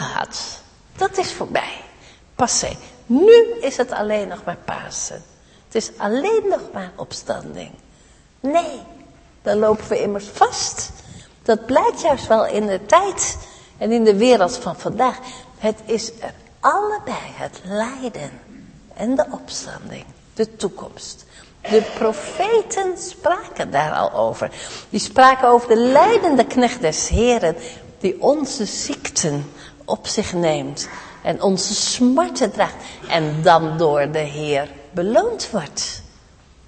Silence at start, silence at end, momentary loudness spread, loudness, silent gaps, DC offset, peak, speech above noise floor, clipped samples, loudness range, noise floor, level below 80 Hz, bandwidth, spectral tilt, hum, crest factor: 0 s; 0.6 s; 17 LU; -19 LUFS; none; under 0.1%; 0 dBFS; 32 dB; under 0.1%; 9 LU; -50 dBFS; -44 dBFS; 8.8 kHz; -4 dB/octave; none; 20 dB